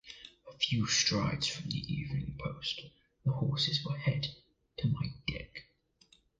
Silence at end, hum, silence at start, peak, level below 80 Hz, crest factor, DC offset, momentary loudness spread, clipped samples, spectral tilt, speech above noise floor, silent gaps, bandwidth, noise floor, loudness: 0.75 s; none; 0.05 s; -16 dBFS; -56 dBFS; 20 dB; under 0.1%; 19 LU; under 0.1%; -4 dB/octave; 35 dB; none; 9.4 kHz; -68 dBFS; -34 LUFS